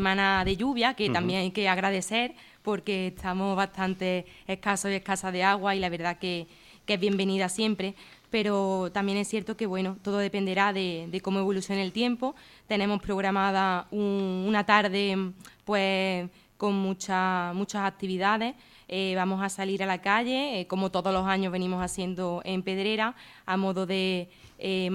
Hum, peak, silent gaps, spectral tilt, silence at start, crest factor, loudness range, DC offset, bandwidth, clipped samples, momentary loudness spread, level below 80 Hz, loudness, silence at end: none; -6 dBFS; none; -4.5 dB/octave; 0 s; 22 dB; 3 LU; under 0.1%; 13.5 kHz; under 0.1%; 8 LU; -56 dBFS; -28 LUFS; 0 s